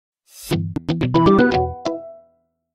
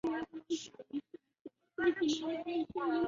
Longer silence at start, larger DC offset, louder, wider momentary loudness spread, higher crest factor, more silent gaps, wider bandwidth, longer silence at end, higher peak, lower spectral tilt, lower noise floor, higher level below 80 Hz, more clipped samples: first, 0.35 s vs 0.05 s; neither; first, -19 LUFS vs -37 LUFS; second, 15 LU vs 19 LU; about the same, 18 dB vs 18 dB; second, none vs 1.41-1.45 s; first, 15.5 kHz vs 7.4 kHz; first, 0.6 s vs 0 s; first, -2 dBFS vs -20 dBFS; first, -7 dB/octave vs -2.5 dB/octave; first, -62 dBFS vs -57 dBFS; first, -40 dBFS vs -70 dBFS; neither